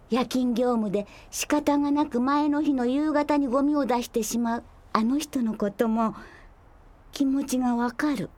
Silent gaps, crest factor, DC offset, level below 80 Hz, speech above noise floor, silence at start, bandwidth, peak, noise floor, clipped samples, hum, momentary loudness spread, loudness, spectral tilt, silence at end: none; 22 dB; under 0.1%; -54 dBFS; 27 dB; 0.1 s; 17 kHz; -4 dBFS; -52 dBFS; under 0.1%; none; 6 LU; -25 LUFS; -4.5 dB/octave; 0.1 s